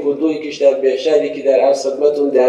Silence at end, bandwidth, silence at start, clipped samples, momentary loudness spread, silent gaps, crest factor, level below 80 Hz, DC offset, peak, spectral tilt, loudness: 0 s; 10 kHz; 0 s; under 0.1%; 4 LU; none; 14 dB; -66 dBFS; under 0.1%; 0 dBFS; -4 dB/octave; -15 LUFS